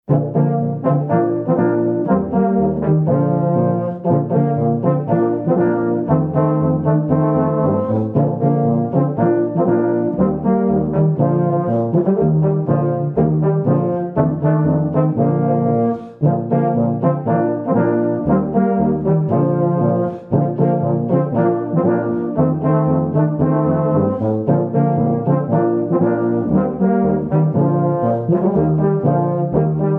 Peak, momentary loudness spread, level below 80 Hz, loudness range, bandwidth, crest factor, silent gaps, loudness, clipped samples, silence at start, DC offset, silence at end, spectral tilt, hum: -2 dBFS; 2 LU; -46 dBFS; 1 LU; 2.8 kHz; 14 dB; none; -17 LUFS; under 0.1%; 0.1 s; under 0.1%; 0 s; -13.5 dB/octave; none